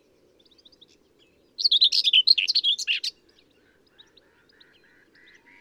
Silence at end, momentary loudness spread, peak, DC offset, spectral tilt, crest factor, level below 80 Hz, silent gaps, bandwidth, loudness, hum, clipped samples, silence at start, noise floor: 2.5 s; 12 LU; -6 dBFS; under 0.1%; 3.5 dB/octave; 22 dB; -78 dBFS; none; 16 kHz; -19 LUFS; none; under 0.1%; 1.6 s; -62 dBFS